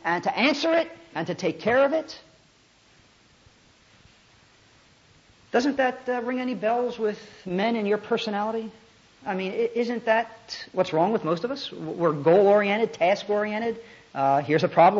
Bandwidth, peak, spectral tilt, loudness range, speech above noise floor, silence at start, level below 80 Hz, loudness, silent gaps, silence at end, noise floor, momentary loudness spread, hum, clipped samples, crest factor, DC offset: 7.8 kHz; -6 dBFS; -5.5 dB/octave; 7 LU; 35 dB; 0.05 s; -68 dBFS; -25 LUFS; none; 0 s; -59 dBFS; 12 LU; none; under 0.1%; 20 dB; under 0.1%